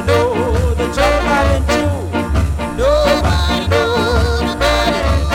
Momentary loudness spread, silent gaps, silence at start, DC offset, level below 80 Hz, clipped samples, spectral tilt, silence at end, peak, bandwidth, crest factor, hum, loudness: 4 LU; none; 0 s; under 0.1%; -20 dBFS; under 0.1%; -5.5 dB/octave; 0 s; 0 dBFS; 16 kHz; 14 dB; none; -15 LUFS